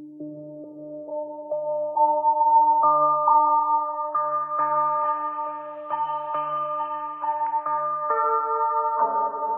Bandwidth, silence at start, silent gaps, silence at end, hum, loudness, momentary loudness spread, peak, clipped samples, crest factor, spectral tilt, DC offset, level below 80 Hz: 3.2 kHz; 0 s; none; 0 s; none; -23 LUFS; 15 LU; -8 dBFS; under 0.1%; 16 dB; -9 dB/octave; under 0.1%; under -90 dBFS